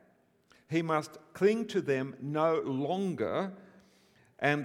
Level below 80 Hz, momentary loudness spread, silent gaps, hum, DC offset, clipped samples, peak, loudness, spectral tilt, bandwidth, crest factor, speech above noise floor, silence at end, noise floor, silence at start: -76 dBFS; 7 LU; none; none; under 0.1%; under 0.1%; -12 dBFS; -32 LUFS; -6.5 dB/octave; 14.5 kHz; 20 dB; 36 dB; 0 s; -67 dBFS; 0.7 s